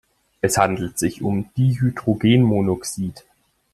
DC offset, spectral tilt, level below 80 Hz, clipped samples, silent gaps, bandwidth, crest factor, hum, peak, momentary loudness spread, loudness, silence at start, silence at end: under 0.1%; -6 dB/octave; -50 dBFS; under 0.1%; none; 14 kHz; 18 dB; none; -2 dBFS; 9 LU; -20 LUFS; 0.45 s; 0.55 s